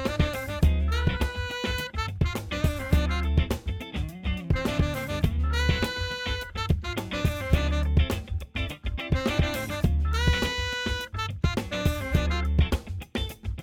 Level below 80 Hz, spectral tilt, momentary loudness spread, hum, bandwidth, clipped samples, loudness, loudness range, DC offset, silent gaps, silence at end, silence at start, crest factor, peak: -30 dBFS; -5.5 dB/octave; 7 LU; none; 16.5 kHz; under 0.1%; -28 LUFS; 1 LU; under 0.1%; none; 0 s; 0 s; 18 dB; -8 dBFS